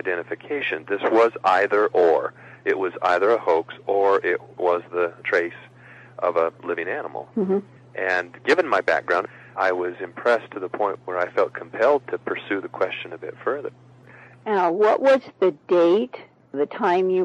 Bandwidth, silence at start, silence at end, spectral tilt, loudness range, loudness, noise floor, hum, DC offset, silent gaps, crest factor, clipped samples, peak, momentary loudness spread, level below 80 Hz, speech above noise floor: 9.2 kHz; 0.05 s; 0 s; -6 dB/octave; 5 LU; -22 LUFS; -47 dBFS; none; under 0.1%; none; 18 dB; under 0.1%; -4 dBFS; 11 LU; -72 dBFS; 25 dB